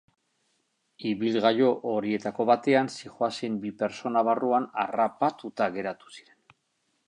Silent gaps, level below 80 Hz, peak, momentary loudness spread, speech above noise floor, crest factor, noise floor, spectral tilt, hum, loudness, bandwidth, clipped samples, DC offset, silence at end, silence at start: none; -74 dBFS; -8 dBFS; 10 LU; 48 dB; 20 dB; -75 dBFS; -5.5 dB/octave; none; -27 LUFS; 11 kHz; under 0.1%; under 0.1%; 0.85 s; 1 s